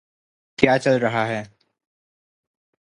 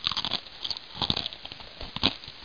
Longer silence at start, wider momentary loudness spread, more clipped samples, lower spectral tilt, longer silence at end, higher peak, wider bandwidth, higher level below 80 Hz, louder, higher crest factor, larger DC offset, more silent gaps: first, 0.6 s vs 0 s; about the same, 12 LU vs 13 LU; neither; first, -6 dB/octave vs -3.5 dB/octave; first, 1.4 s vs 0 s; first, 0 dBFS vs -6 dBFS; first, 11 kHz vs 5.4 kHz; second, -56 dBFS vs -50 dBFS; first, -20 LUFS vs -29 LUFS; about the same, 24 dB vs 28 dB; second, under 0.1% vs 0.2%; neither